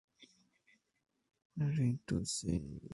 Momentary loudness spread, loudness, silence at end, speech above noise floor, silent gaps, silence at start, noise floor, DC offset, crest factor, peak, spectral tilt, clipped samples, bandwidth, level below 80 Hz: 6 LU; -37 LUFS; 0 s; 37 dB; 1.45-1.50 s; 0.2 s; -74 dBFS; under 0.1%; 18 dB; -22 dBFS; -5.5 dB/octave; under 0.1%; 11.5 kHz; -58 dBFS